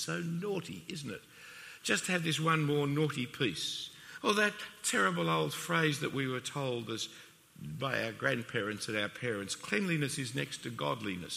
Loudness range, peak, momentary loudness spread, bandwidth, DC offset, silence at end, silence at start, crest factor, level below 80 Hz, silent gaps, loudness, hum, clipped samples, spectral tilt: 4 LU; -14 dBFS; 12 LU; 15.5 kHz; under 0.1%; 0 s; 0 s; 22 dB; -72 dBFS; none; -34 LUFS; none; under 0.1%; -4 dB/octave